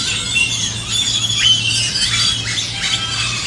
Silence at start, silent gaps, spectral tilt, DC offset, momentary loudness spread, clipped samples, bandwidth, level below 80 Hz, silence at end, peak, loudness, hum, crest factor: 0 s; none; -0.5 dB/octave; under 0.1%; 6 LU; under 0.1%; 12 kHz; -40 dBFS; 0 s; -2 dBFS; -14 LUFS; none; 16 dB